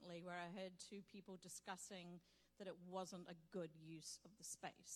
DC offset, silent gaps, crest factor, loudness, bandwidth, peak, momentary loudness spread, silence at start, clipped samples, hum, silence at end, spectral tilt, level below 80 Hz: under 0.1%; none; 20 dB; -55 LUFS; 17.5 kHz; -36 dBFS; 7 LU; 0 s; under 0.1%; none; 0 s; -3.5 dB/octave; -88 dBFS